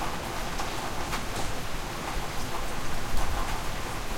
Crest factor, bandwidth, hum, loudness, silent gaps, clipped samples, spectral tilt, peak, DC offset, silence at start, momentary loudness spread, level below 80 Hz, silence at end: 14 dB; 16.5 kHz; none; -33 LUFS; none; under 0.1%; -3.5 dB/octave; -14 dBFS; under 0.1%; 0 s; 2 LU; -34 dBFS; 0 s